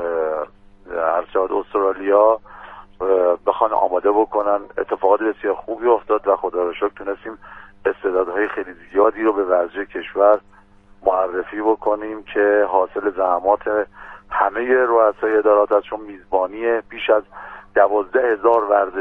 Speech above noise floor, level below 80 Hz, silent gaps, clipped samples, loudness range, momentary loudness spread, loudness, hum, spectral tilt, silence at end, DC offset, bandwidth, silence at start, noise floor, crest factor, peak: 30 dB; -52 dBFS; none; under 0.1%; 3 LU; 10 LU; -19 LUFS; none; -7 dB/octave; 0 s; under 0.1%; 3.8 kHz; 0 s; -48 dBFS; 18 dB; -2 dBFS